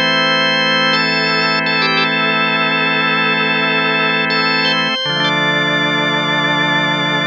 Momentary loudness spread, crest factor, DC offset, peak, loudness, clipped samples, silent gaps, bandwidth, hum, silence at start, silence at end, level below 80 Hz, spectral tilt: 2 LU; 12 dB; under 0.1%; -2 dBFS; -13 LUFS; under 0.1%; none; 8.8 kHz; none; 0 s; 0 s; -72 dBFS; -4 dB/octave